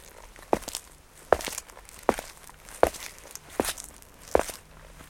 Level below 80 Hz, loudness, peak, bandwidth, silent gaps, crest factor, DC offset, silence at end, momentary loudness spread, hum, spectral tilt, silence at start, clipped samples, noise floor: -50 dBFS; -30 LUFS; -2 dBFS; 17 kHz; none; 30 dB; under 0.1%; 0.05 s; 21 LU; none; -3 dB/octave; 0 s; under 0.1%; -51 dBFS